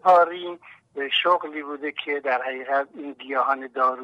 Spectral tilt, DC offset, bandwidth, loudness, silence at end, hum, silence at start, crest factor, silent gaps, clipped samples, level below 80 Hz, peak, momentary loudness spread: -4 dB/octave; under 0.1%; 7.8 kHz; -24 LUFS; 0 s; none; 0.05 s; 18 dB; none; under 0.1%; -78 dBFS; -6 dBFS; 15 LU